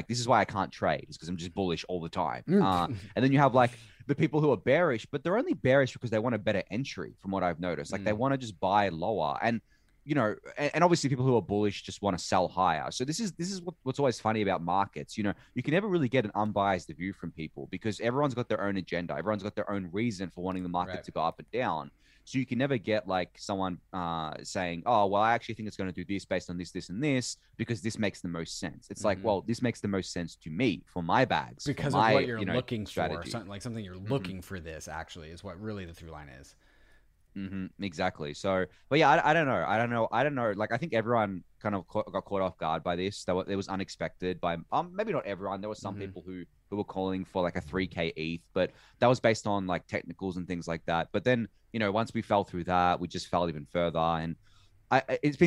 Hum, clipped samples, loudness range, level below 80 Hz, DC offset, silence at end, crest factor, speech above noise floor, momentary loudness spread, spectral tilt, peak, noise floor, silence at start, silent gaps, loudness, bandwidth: none; under 0.1%; 7 LU; -60 dBFS; under 0.1%; 0 s; 22 dB; 31 dB; 13 LU; -6 dB/octave; -8 dBFS; -61 dBFS; 0 s; none; -31 LUFS; 13.5 kHz